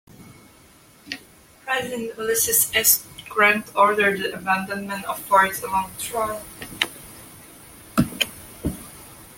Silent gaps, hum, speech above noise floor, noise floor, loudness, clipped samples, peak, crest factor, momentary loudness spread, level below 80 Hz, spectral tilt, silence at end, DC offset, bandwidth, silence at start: none; none; 29 dB; -51 dBFS; -21 LUFS; under 0.1%; -2 dBFS; 22 dB; 20 LU; -50 dBFS; -2 dB/octave; 0.05 s; under 0.1%; 17 kHz; 0.2 s